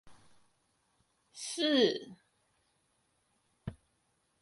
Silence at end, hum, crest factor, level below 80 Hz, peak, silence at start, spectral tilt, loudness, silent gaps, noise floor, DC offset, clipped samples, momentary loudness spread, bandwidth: 0.7 s; none; 24 dB; -66 dBFS; -16 dBFS; 0.05 s; -3.5 dB/octave; -31 LUFS; none; -77 dBFS; under 0.1%; under 0.1%; 21 LU; 11.5 kHz